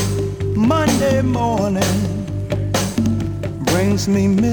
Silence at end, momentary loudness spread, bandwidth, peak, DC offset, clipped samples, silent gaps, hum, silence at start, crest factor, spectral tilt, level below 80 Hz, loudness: 0 s; 7 LU; over 20 kHz; -4 dBFS; under 0.1%; under 0.1%; none; none; 0 s; 14 dB; -6 dB/octave; -34 dBFS; -18 LUFS